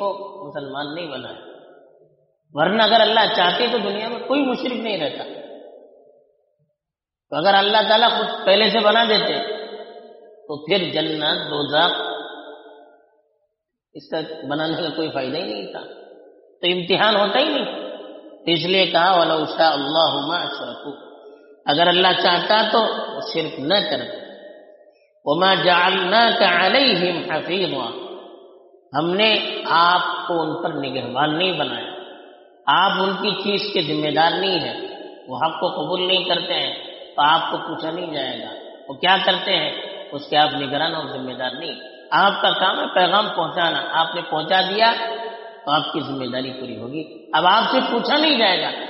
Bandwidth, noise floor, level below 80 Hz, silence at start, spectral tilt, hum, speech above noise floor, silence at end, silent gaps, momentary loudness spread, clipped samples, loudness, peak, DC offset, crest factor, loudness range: 6 kHz; -87 dBFS; -70 dBFS; 0 s; -1 dB/octave; none; 67 dB; 0 s; none; 17 LU; under 0.1%; -19 LUFS; -2 dBFS; under 0.1%; 18 dB; 6 LU